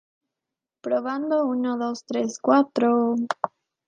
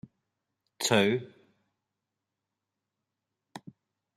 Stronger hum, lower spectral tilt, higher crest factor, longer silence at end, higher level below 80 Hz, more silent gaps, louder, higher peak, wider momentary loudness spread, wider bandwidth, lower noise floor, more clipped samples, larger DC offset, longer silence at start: neither; about the same, -5 dB/octave vs -4 dB/octave; second, 22 dB vs 28 dB; second, 0.4 s vs 0.6 s; about the same, -78 dBFS vs -76 dBFS; neither; first, -24 LUFS vs -27 LUFS; first, -4 dBFS vs -8 dBFS; second, 8 LU vs 24 LU; second, 9 kHz vs 13.5 kHz; about the same, -87 dBFS vs -87 dBFS; neither; neither; about the same, 0.85 s vs 0.8 s